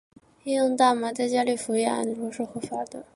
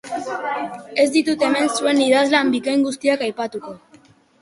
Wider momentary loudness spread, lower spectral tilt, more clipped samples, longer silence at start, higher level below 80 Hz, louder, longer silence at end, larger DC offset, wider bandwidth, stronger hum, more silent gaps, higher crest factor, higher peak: about the same, 12 LU vs 12 LU; about the same, -3.5 dB/octave vs -3 dB/octave; neither; first, 0.45 s vs 0.05 s; about the same, -70 dBFS vs -66 dBFS; second, -26 LUFS vs -19 LUFS; second, 0.15 s vs 0.65 s; neither; about the same, 11.5 kHz vs 11.5 kHz; neither; neither; about the same, 18 dB vs 16 dB; second, -8 dBFS vs -2 dBFS